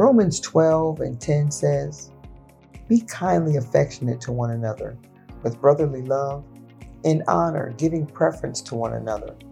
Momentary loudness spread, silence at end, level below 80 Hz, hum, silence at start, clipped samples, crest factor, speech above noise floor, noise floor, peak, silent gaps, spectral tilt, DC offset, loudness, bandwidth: 11 LU; 0 s; -48 dBFS; none; 0 s; under 0.1%; 20 dB; 24 dB; -46 dBFS; -2 dBFS; none; -6.5 dB/octave; under 0.1%; -22 LUFS; 12 kHz